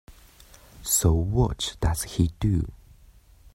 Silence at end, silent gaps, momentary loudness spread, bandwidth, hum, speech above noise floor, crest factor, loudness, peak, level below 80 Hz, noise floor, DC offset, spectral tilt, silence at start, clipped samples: 0.8 s; none; 7 LU; 16.5 kHz; none; 30 dB; 18 dB; -25 LUFS; -8 dBFS; -36 dBFS; -53 dBFS; under 0.1%; -5 dB/octave; 0.1 s; under 0.1%